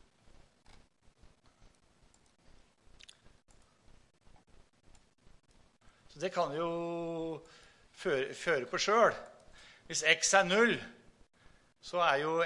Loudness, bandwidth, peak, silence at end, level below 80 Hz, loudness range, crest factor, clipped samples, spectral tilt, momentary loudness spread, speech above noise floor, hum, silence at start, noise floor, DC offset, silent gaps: -31 LUFS; 11.5 kHz; -10 dBFS; 0 s; -66 dBFS; 11 LU; 26 dB; under 0.1%; -2.5 dB/octave; 17 LU; 36 dB; none; 6.15 s; -67 dBFS; under 0.1%; none